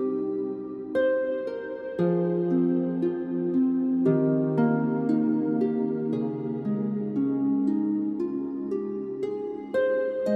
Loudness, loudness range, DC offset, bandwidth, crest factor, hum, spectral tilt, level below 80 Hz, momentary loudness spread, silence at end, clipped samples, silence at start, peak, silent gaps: -27 LUFS; 3 LU; under 0.1%; 4.7 kHz; 14 dB; none; -10 dB/octave; -68 dBFS; 8 LU; 0 s; under 0.1%; 0 s; -12 dBFS; none